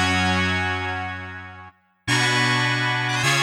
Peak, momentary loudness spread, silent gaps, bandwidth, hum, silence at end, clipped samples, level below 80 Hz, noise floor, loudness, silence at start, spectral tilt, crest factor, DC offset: -6 dBFS; 15 LU; none; 16 kHz; none; 0 s; under 0.1%; -52 dBFS; -46 dBFS; -21 LUFS; 0 s; -3.5 dB/octave; 16 dB; under 0.1%